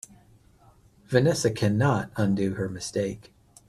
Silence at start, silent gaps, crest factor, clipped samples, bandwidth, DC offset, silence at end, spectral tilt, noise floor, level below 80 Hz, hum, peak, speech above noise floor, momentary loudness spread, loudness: 1.1 s; none; 20 dB; under 0.1%; 13.5 kHz; under 0.1%; 0.5 s; -6 dB/octave; -57 dBFS; -56 dBFS; none; -6 dBFS; 33 dB; 9 LU; -26 LUFS